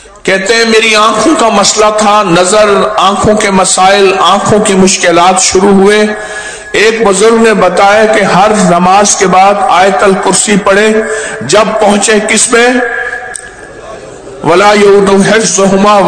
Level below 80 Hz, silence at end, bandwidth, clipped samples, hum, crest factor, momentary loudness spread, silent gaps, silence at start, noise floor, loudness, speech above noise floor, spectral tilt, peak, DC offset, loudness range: -36 dBFS; 0 s; 11 kHz; 10%; none; 6 dB; 9 LU; none; 0.25 s; -26 dBFS; -6 LUFS; 21 dB; -3.5 dB/octave; 0 dBFS; under 0.1%; 3 LU